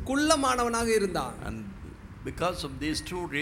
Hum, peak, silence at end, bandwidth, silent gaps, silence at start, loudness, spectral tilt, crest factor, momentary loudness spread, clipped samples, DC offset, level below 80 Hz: none; -8 dBFS; 0 s; 16.5 kHz; none; 0 s; -28 LUFS; -4 dB/octave; 20 dB; 17 LU; under 0.1%; under 0.1%; -46 dBFS